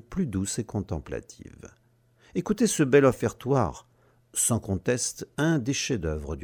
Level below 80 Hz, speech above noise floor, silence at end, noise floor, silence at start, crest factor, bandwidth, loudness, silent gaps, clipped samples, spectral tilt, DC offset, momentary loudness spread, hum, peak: -46 dBFS; 35 dB; 0 s; -61 dBFS; 0.1 s; 20 dB; 19 kHz; -26 LUFS; none; under 0.1%; -5 dB/octave; under 0.1%; 14 LU; none; -8 dBFS